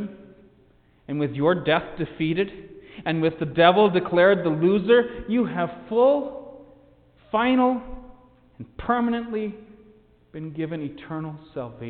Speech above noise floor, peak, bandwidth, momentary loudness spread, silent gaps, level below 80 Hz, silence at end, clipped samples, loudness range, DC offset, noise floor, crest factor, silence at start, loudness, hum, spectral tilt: 35 dB; -4 dBFS; 4.6 kHz; 17 LU; none; -52 dBFS; 0 s; under 0.1%; 10 LU; under 0.1%; -58 dBFS; 20 dB; 0 s; -23 LUFS; none; -10.5 dB/octave